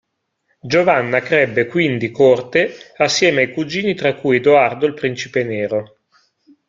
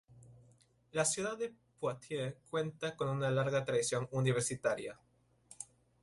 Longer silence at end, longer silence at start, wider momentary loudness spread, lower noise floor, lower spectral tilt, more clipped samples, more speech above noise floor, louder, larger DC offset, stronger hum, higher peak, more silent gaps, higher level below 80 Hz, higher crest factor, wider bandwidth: first, 0.85 s vs 0.4 s; first, 0.65 s vs 0.1 s; second, 8 LU vs 12 LU; about the same, -68 dBFS vs -67 dBFS; about the same, -4.5 dB/octave vs -4.5 dB/octave; neither; first, 52 dB vs 32 dB; first, -16 LUFS vs -36 LUFS; neither; neither; first, 0 dBFS vs -20 dBFS; neither; first, -58 dBFS vs -70 dBFS; about the same, 16 dB vs 18 dB; second, 7.6 kHz vs 11.5 kHz